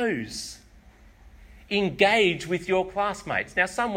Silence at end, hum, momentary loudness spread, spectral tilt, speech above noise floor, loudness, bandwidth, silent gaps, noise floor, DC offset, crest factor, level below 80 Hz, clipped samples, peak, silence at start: 0 s; none; 13 LU; -4 dB/octave; 27 dB; -25 LUFS; 16 kHz; none; -52 dBFS; under 0.1%; 20 dB; -52 dBFS; under 0.1%; -6 dBFS; 0 s